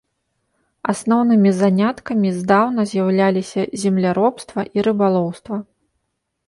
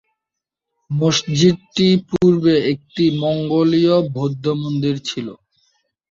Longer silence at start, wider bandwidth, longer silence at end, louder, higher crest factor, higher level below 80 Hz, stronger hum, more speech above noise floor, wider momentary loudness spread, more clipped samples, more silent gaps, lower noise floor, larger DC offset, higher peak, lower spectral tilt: about the same, 0.85 s vs 0.9 s; first, 11.5 kHz vs 7.6 kHz; about the same, 0.85 s vs 0.75 s; about the same, -18 LUFS vs -17 LUFS; about the same, 16 dB vs 16 dB; about the same, -58 dBFS vs -54 dBFS; neither; second, 56 dB vs 67 dB; about the same, 10 LU vs 8 LU; neither; neither; second, -73 dBFS vs -83 dBFS; neither; about the same, -2 dBFS vs -2 dBFS; about the same, -7 dB/octave vs -6 dB/octave